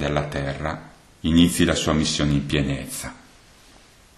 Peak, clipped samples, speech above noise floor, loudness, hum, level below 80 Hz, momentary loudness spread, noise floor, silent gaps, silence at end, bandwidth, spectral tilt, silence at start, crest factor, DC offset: -4 dBFS; under 0.1%; 29 dB; -22 LUFS; none; -38 dBFS; 14 LU; -51 dBFS; none; 1 s; 13 kHz; -5 dB/octave; 0 s; 20 dB; under 0.1%